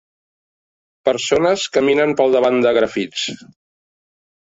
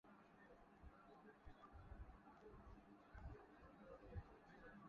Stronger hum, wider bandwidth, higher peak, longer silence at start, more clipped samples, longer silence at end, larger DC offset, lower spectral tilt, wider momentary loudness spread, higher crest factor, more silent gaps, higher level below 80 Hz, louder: neither; first, 8 kHz vs 6.8 kHz; first, -2 dBFS vs -42 dBFS; first, 1.05 s vs 0.05 s; neither; first, 1.25 s vs 0 s; neither; second, -4 dB/octave vs -6.5 dB/octave; about the same, 9 LU vs 8 LU; about the same, 16 dB vs 20 dB; neither; first, -58 dBFS vs -66 dBFS; first, -17 LUFS vs -64 LUFS